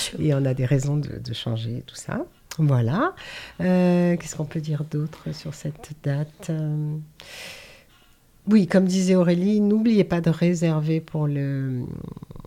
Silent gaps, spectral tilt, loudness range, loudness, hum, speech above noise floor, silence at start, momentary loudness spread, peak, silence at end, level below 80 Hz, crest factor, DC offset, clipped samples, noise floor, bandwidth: none; -7 dB/octave; 9 LU; -23 LUFS; none; 33 dB; 0 s; 16 LU; -6 dBFS; 0.05 s; -52 dBFS; 18 dB; under 0.1%; under 0.1%; -55 dBFS; 15 kHz